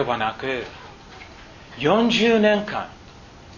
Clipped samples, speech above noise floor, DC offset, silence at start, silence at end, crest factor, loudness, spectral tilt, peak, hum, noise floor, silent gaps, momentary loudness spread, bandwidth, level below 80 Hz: under 0.1%; 24 dB; under 0.1%; 0 s; 0 s; 20 dB; -21 LUFS; -5 dB/octave; -4 dBFS; none; -44 dBFS; none; 24 LU; 7.4 kHz; -50 dBFS